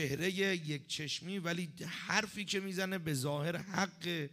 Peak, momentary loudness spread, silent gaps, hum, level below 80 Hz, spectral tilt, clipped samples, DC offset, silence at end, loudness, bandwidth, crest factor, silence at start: -14 dBFS; 5 LU; none; none; -72 dBFS; -4 dB/octave; under 0.1%; under 0.1%; 0 s; -37 LUFS; 15.5 kHz; 24 dB; 0 s